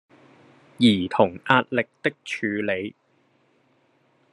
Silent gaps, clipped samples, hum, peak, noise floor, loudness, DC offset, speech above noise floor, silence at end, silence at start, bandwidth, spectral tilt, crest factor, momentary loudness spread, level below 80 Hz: none; under 0.1%; none; 0 dBFS; -64 dBFS; -23 LUFS; under 0.1%; 42 dB; 1.45 s; 0.8 s; 11.5 kHz; -6 dB/octave; 24 dB; 9 LU; -70 dBFS